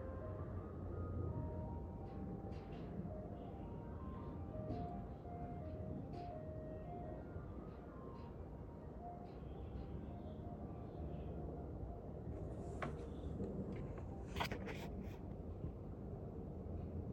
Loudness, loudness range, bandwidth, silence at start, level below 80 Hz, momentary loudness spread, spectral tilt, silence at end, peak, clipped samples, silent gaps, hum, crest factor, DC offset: -49 LUFS; 4 LU; 13.5 kHz; 0 s; -56 dBFS; 6 LU; -8 dB/octave; 0 s; -28 dBFS; under 0.1%; none; none; 20 dB; under 0.1%